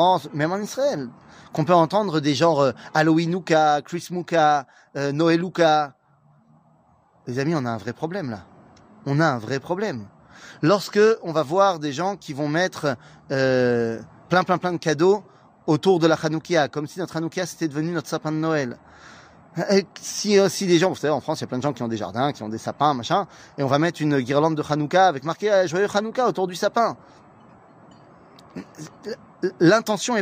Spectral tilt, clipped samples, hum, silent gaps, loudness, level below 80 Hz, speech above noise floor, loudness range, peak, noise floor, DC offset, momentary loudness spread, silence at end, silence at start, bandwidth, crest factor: -5.5 dB/octave; under 0.1%; none; none; -22 LUFS; -66 dBFS; 37 dB; 6 LU; -4 dBFS; -58 dBFS; under 0.1%; 13 LU; 0 s; 0 s; 15.5 kHz; 18 dB